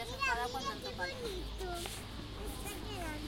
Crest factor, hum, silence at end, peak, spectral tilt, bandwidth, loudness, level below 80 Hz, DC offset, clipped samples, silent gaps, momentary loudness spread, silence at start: 18 dB; none; 0 s; -22 dBFS; -3.5 dB/octave; 16.5 kHz; -40 LUFS; -48 dBFS; under 0.1%; under 0.1%; none; 10 LU; 0 s